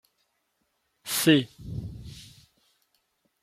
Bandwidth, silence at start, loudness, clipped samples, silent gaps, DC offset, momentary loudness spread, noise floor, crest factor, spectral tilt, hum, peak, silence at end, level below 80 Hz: 16 kHz; 1.05 s; -25 LUFS; under 0.1%; none; under 0.1%; 23 LU; -75 dBFS; 24 dB; -4 dB/octave; none; -6 dBFS; 1.2 s; -54 dBFS